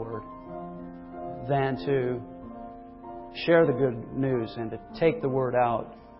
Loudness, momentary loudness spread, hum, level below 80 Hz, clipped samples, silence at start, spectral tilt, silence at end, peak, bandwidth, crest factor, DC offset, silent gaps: -27 LUFS; 19 LU; none; -54 dBFS; under 0.1%; 0 s; -11 dB/octave; 0 s; -8 dBFS; 5.8 kHz; 20 dB; under 0.1%; none